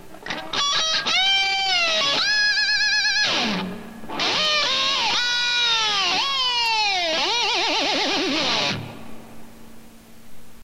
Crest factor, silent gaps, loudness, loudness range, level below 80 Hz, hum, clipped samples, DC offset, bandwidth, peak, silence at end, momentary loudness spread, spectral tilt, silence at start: 14 dB; none; -19 LUFS; 4 LU; -54 dBFS; none; under 0.1%; under 0.1%; 16 kHz; -8 dBFS; 0 s; 8 LU; -1 dB/octave; 0 s